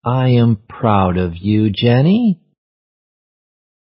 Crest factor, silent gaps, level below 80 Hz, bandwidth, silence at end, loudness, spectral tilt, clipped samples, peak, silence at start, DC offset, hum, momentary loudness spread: 16 dB; none; -38 dBFS; 5.6 kHz; 1.65 s; -15 LUFS; -13 dB/octave; under 0.1%; 0 dBFS; 0.05 s; under 0.1%; none; 6 LU